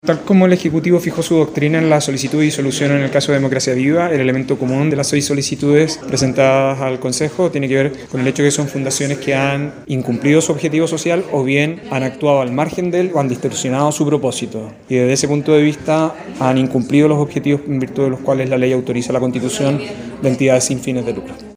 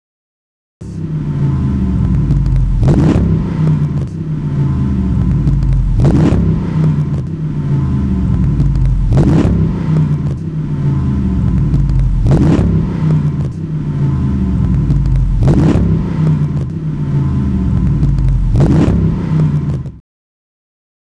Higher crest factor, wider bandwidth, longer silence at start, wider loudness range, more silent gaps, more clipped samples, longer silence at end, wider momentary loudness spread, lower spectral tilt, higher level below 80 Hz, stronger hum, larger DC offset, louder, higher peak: about the same, 16 dB vs 12 dB; first, 16 kHz vs 8.6 kHz; second, 0.05 s vs 0.8 s; about the same, 2 LU vs 1 LU; neither; neither; second, 0 s vs 1.1 s; about the same, 6 LU vs 8 LU; second, -5.5 dB/octave vs -9.5 dB/octave; second, -52 dBFS vs -18 dBFS; neither; second, under 0.1% vs 1%; about the same, -16 LUFS vs -14 LUFS; about the same, 0 dBFS vs 0 dBFS